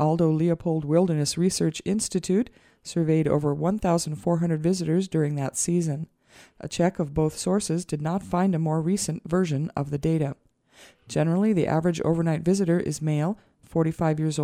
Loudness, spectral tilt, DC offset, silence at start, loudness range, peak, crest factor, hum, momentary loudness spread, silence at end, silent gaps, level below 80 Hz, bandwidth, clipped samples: -25 LUFS; -6 dB/octave; under 0.1%; 0 s; 2 LU; -8 dBFS; 16 dB; none; 7 LU; 0 s; none; -52 dBFS; 14.5 kHz; under 0.1%